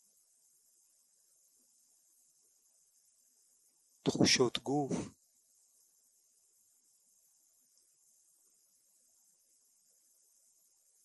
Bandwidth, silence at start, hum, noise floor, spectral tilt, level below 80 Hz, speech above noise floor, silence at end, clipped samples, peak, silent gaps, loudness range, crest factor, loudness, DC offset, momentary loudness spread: 12 kHz; 4.05 s; none; -72 dBFS; -3.5 dB/octave; -74 dBFS; 40 dB; 5.95 s; under 0.1%; -14 dBFS; none; 11 LU; 26 dB; -32 LUFS; under 0.1%; 13 LU